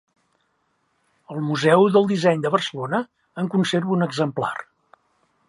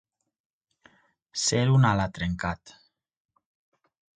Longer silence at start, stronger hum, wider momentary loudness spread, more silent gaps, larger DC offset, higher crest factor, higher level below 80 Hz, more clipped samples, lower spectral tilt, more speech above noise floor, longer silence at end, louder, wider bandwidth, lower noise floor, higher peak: about the same, 1.3 s vs 1.35 s; neither; about the same, 13 LU vs 14 LU; neither; neither; about the same, 20 dB vs 20 dB; second, -70 dBFS vs -50 dBFS; neither; about the same, -6 dB/octave vs -5 dB/octave; first, 49 dB vs 37 dB; second, 0.85 s vs 1.45 s; first, -21 LUFS vs -25 LUFS; first, 11.5 kHz vs 9.4 kHz; first, -69 dBFS vs -62 dBFS; first, -2 dBFS vs -8 dBFS